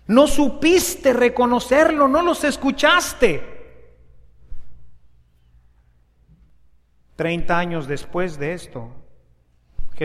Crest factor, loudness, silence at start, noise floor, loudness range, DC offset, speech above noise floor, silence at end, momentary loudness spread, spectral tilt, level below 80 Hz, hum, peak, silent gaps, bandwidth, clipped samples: 20 dB; -18 LUFS; 0.1 s; -56 dBFS; 12 LU; under 0.1%; 39 dB; 0 s; 12 LU; -4 dB/octave; -38 dBFS; none; 0 dBFS; none; 15 kHz; under 0.1%